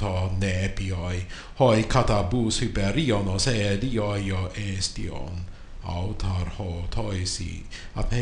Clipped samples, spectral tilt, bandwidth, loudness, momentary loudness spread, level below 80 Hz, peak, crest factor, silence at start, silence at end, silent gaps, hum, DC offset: under 0.1%; -5 dB/octave; 10.5 kHz; -26 LUFS; 13 LU; -34 dBFS; -6 dBFS; 20 dB; 0 s; 0 s; none; none; under 0.1%